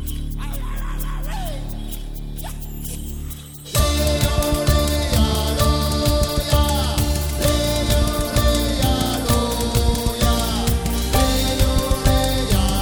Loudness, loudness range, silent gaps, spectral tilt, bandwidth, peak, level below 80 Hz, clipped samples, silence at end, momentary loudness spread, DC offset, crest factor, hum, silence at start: -20 LUFS; 8 LU; none; -4.5 dB/octave; over 20 kHz; -4 dBFS; -22 dBFS; under 0.1%; 0 s; 12 LU; under 0.1%; 16 dB; none; 0 s